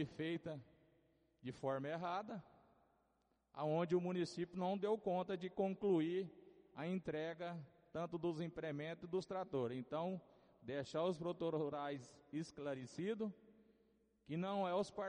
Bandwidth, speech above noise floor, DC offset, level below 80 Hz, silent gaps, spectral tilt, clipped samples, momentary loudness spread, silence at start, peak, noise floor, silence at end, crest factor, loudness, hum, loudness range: 10 kHz; 39 dB; under 0.1%; -80 dBFS; none; -7 dB/octave; under 0.1%; 13 LU; 0 s; -26 dBFS; -82 dBFS; 0 s; 18 dB; -44 LUFS; none; 5 LU